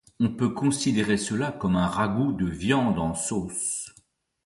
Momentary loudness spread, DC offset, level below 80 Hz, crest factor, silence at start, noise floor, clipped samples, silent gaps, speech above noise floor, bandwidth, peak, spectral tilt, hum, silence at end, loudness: 5 LU; under 0.1%; -48 dBFS; 18 dB; 0.2 s; -61 dBFS; under 0.1%; none; 36 dB; 11.5 kHz; -8 dBFS; -5 dB/octave; none; 0.55 s; -26 LUFS